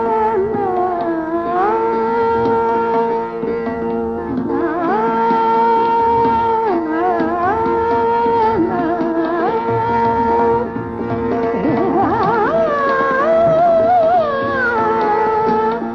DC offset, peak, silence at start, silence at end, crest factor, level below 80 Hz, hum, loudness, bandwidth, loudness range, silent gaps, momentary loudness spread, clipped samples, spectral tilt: under 0.1%; -4 dBFS; 0 s; 0 s; 10 dB; -42 dBFS; none; -16 LUFS; 6.4 kHz; 3 LU; none; 7 LU; under 0.1%; -8 dB/octave